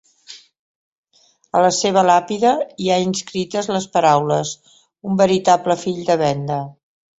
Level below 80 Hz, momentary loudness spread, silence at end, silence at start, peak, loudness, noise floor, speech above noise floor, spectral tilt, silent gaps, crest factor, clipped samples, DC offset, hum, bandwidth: -58 dBFS; 10 LU; 0.5 s; 0.3 s; -2 dBFS; -18 LUFS; -58 dBFS; 41 dB; -4.5 dB/octave; 0.59-1.04 s; 18 dB; under 0.1%; under 0.1%; none; 8.2 kHz